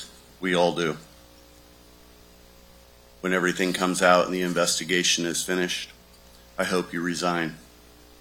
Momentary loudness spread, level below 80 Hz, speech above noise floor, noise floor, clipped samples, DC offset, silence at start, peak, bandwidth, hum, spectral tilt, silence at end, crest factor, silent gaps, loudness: 12 LU; -58 dBFS; 28 dB; -52 dBFS; under 0.1%; under 0.1%; 0 s; -4 dBFS; 17.5 kHz; 60 Hz at -50 dBFS; -3 dB/octave; 0.6 s; 22 dB; none; -24 LUFS